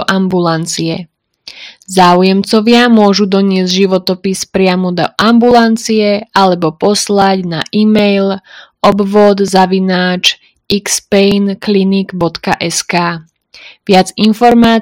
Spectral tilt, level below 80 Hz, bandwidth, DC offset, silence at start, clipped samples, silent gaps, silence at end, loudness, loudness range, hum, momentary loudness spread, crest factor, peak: -5 dB/octave; -46 dBFS; 16.5 kHz; under 0.1%; 0 s; 1%; none; 0 s; -10 LUFS; 3 LU; none; 9 LU; 10 dB; 0 dBFS